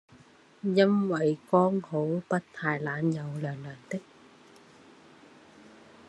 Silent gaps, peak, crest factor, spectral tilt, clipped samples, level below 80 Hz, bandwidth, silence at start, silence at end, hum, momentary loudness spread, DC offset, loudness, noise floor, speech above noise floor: none; -8 dBFS; 22 dB; -7.5 dB/octave; under 0.1%; -76 dBFS; 10 kHz; 0.65 s; 2.05 s; none; 14 LU; under 0.1%; -29 LUFS; -57 dBFS; 29 dB